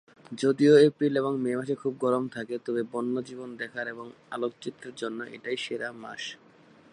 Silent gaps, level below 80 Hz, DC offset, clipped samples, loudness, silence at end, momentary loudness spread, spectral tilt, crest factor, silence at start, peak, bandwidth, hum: none; -78 dBFS; under 0.1%; under 0.1%; -28 LUFS; 0.6 s; 19 LU; -6 dB/octave; 20 dB; 0.3 s; -8 dBFS; 10.5 kHz; none